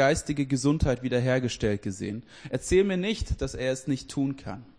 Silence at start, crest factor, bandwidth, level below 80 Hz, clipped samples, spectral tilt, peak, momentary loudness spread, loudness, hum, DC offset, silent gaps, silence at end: 0 s; 16 dB; 10.5 kHz; -40 dBFS; under 0.1%; -5.5 dB/octave; -10 dBFS; 11 LU; -28 LUFS; none; under 0.1%; none; 0.15 s